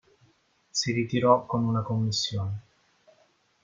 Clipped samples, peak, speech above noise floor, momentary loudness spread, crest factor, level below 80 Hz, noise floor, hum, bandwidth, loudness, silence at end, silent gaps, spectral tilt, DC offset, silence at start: under 0.1%; -6 dBFS; 40 dB; 10 LU; 22 dB; -64 dBFS; -66 dBFS; none; 9.2 kHz; -27 LUFS; 1.05 s; none; -5 dB/octave; under 0.1%; 0.75 s